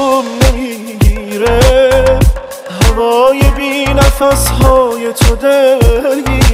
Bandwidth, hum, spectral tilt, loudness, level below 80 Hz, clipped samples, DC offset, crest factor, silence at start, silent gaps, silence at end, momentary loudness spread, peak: 16.5 kHz; none; -5 dB/octave; -10 LUFS; -14 dBFS; under 0.1%; under 0.1%; 8 dB; 0 s; none; 0 s; 6 LU; 0 dBFS